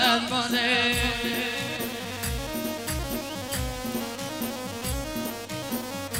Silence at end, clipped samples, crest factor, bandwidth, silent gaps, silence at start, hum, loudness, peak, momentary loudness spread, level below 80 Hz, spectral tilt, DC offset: 0 s; under 0.1%; 20 dB; 16 kHz; none; 0 s; none; -28 LUFS; -10 dBFS; 10 LU; -42 dBFS; -3 dB/octave; under 0.1%